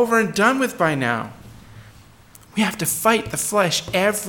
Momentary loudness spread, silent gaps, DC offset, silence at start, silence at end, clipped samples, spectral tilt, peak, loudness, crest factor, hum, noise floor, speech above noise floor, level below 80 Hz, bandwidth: 6 LU; none; under 0.1%; 0 s; 0 s; under 0.1%; -3.5 dB/octave; -2 dBFS; -20 LUFS; 20 dB; none; -47 dBFS; 28 dB; -52 dBFS; 17.5 kHz